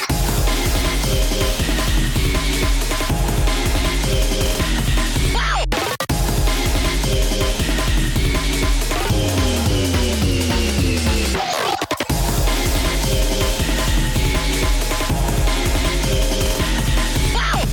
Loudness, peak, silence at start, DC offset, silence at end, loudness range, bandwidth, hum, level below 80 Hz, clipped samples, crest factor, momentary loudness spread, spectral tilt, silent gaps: -19 LUFS; -8 dBFS; 0 s; under 0.1%; 0 s; 1 LU; 17.5 kHz; none; -20 dBFS; under 0.1%; 10 dB; 2 LU; -4 dB/octave; none